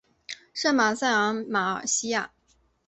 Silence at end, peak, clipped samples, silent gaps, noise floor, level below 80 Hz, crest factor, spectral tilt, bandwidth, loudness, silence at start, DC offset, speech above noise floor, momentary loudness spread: 0.6 s; -8 dBFS; under 0.1%; none; -66 dBFS; -70 dBFS; 18 dB; -2 dB/octave; 8.4 kHz; -25 LUFS; 0.3 s; under 0.1%; 41 dB; 17 LU